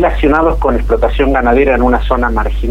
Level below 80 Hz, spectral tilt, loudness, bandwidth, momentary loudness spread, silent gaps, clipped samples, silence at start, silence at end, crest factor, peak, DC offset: -16 dBFS; -8 dB/octave; -12 LUFS; 5.2 kHz; 4 LU; none; under 0.1%; 0 s; 0 s; 10 dB; 0 dBFS; under 0.1%